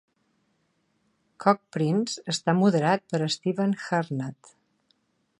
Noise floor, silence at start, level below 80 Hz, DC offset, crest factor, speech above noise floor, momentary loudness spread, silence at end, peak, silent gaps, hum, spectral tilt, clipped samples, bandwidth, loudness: -72 dBFS; 1.4 s; -74 dBFS; under 0.1%; 24 dB; 47 dB; 7 LU; 1.05 s; -4 dBFS; none; none; -5.5 dB/octave; under 0.1%; 11.5 kHz; -26 LUFS